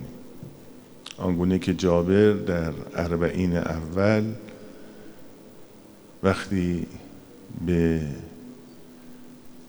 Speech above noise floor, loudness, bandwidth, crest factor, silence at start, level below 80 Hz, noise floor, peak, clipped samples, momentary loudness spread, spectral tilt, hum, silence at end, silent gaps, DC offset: 25 dB; -24 LUFS; over 20 kHz; 22 dB; 0 s; -50 dBFS; -48 dBFS; -4 dBFS; under 0.1%; 25 LU; -7.5 dB/octave; none; 0 s; none; under 0.1%